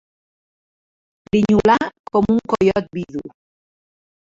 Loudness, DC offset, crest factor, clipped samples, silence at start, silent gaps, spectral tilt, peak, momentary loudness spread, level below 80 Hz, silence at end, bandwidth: -18 LUFS; under 0.1%; 18 dB; under 0.1%; 1.35 s; 1.99-2.04 s; -7 dB/octave; -2 dBFS; 13 LU; -46 dBFS; 1.05 s; 7.6 kHz